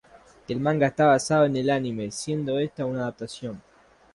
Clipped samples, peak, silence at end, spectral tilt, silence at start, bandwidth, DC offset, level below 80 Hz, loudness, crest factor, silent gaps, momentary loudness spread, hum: under 0.1%; -8 dBFS; 0.55 s; -5.5 dB/octave; 0.15 s; 11.5 kHz; under 0.1%; -60 dBFS; -25 LUFS; 18 dB; none; 15 LU; none